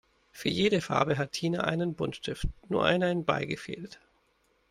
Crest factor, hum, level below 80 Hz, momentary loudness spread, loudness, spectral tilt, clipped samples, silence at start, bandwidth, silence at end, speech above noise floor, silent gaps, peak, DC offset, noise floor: 20 dB; none; -48 dBFS; 11 LU; -29 LUFS; -5.5 dB/octave; under 0.1%; 0.35 s; 15.5 kHz; 0.75 s; 41 dB; none; -10 dBFS; under 0.1%; -70 dBFS